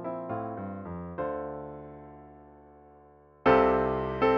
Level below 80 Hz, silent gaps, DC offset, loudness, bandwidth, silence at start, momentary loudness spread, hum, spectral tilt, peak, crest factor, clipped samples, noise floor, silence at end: -50 dBFS; none; under 0.1%; -29 LUFS; 6.4 kHz; 0 s; 24 LU; none; -8.5 dB/octave; -10 dBFS; 20 dB; under 0.1%; -56 dBFS; 0 s